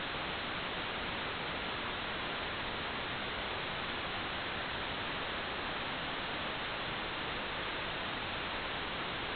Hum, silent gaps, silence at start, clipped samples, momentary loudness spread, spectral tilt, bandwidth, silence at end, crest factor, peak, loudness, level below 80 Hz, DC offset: none; none; 0 s; under 0.1%; 0 LU; -1 dB/octave; 4.9 kHz; 0 s; 14 dB; -24 dBFS; -37 LUFS; -56 dBFS; under 0.1%